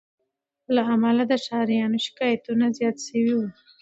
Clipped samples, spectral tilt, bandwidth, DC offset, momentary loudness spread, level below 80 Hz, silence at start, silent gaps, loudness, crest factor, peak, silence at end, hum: under 0.1%; -5 dB/octave; 8 kHz; under 0.1%; 5 LU; -72 dBFS; 0.7 s; none; -23 LUFS; 16 dB; -8 dBFS; 0.3 s; none